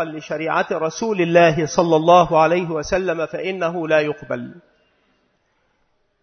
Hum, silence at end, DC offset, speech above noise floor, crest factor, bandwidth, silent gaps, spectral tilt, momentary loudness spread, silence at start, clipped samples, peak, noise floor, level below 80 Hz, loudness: none; 1.65 s; under 0.1%; 47 dB; 20 dB; 6.6 kHz; none; -5.5 dB/octave; 13 LU; 0 s; under 0.1%; 0 dBFS; -65 dBFS; -50 dBFS; -18 LUFS